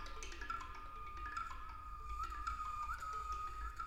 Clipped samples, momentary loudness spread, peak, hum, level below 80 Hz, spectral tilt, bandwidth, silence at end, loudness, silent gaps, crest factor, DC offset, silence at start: under 0.1%; 7 LU; -30 dBFS; none; -52 dBFS; -3 dB/octave; 16 kHz; 0 s; -46 LUFS; none; 16 dB; under 0.1%; 0 s